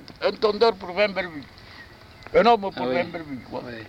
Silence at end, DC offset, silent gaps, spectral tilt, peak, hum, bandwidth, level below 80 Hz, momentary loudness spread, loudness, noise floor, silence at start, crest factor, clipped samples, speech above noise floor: 0 s; under 0.1%; none; -6 dB/octave; -6 dBFS; none; 8.8 kHz; -54 dBFS; 23 LU; -23 LUFS; -46 dBFS; 0 s; 18 dB; under 0.1%; 22 dB